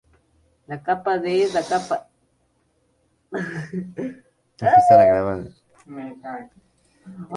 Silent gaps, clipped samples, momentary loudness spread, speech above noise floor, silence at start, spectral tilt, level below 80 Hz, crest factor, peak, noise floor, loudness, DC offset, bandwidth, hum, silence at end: none; under 0.1%; 23 LU; 46 dB; 0.7 s; -6 dB/octave; -56 dBFS; 20 dB; -2 dBFS; -66 dBFS; -20 LUFS; under 0.1%; 11 kHz; none; 0 s